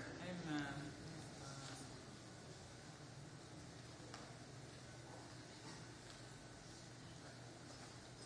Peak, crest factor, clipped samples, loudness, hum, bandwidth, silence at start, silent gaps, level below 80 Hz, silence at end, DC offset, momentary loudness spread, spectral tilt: -32 dBFS; 22 dB; under 0.1%; -54 LUFS; none; 10.5 kHz; 0 s; none; -72 dBFS; 0 s; under 0.1%; 8 LU; -4.5 dB/octave